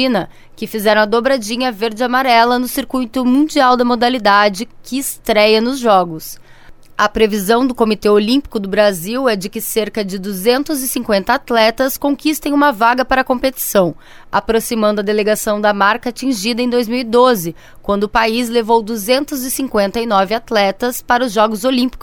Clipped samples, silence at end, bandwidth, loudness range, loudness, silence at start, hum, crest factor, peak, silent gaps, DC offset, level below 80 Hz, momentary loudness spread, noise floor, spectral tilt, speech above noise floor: under 0.1%; 0 s; 19 kHz; 2 LU; -15 LUFS; 0 s; none; 14 dB; 0 dBFS; none; under 0.1%; -42 dBFS; 8 LU; -38 dBFS; -4 dB/octave; 23 dB